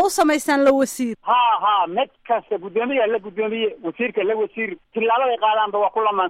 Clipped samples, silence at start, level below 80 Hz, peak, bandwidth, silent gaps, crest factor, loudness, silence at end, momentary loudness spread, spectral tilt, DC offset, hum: under 0.1%; 0 s; -62 dBFS; -4 dBFS; 16 kHz; none; 14 dB; -20 LUFS; 0 s; 8 LU; -3 dB/octave; under 0.1%; none